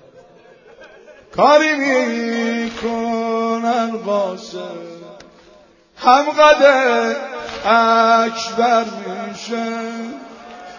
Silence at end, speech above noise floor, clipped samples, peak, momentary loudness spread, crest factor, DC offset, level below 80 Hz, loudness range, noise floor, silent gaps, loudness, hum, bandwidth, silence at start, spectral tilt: 0 s; 33 dB; under 0.1%; 0 dBFS; 18 LU; 18 dB; under 0.1%; -58 dBFS; 7 LU; -48 dBFS; none; -16 LUFS; none; 7.4 kHz; 0.8 s; -3.5 dB/octave